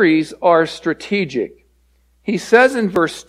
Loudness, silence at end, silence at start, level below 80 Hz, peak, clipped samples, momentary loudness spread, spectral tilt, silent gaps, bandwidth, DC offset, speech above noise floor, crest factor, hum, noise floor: -16 LUFS; 0.05 s; 0 s; -54 dBFS; 0 dBFS; under 0.1%; 12 LU; -5.5 dB/octave; none; 14 kHz; under 0.1%; 41 dB; 16 dB; none; -57 dBFS